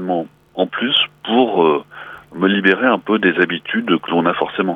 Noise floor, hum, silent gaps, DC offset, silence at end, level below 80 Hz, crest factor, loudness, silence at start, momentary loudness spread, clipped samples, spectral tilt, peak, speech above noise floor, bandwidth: -36 dBFS; none; none; under 0.1%; 0 s; -62 dBFS; 16 dB; -16 LUFS; 0 s; 9 LU; under 0.1%; -7 dB/octave; -2 dBFS; 20 dB; 4.9 kHz